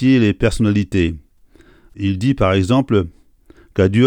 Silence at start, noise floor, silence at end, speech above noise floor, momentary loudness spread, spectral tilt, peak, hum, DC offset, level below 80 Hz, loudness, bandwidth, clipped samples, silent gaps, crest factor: 0 s; -49 dBFS; 0 s; 34 dB; 10 LU; -7 dB/octave; -2 dBFS; none; under 0.1%; -36 dBFS; -17 LUFS; 10.5 kHz; under 0.1%; none; 16 dB